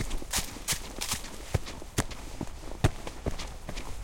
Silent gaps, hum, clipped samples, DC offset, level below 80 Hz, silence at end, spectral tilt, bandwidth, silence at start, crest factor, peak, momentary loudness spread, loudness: none; none; under 0.1%; under 0.1%; -40 dBFS; 0 s; -3.5 dB/octave; 17 kHz; 0 s; 24 dB; -10 dBFS; 10 LU; -34 LUFS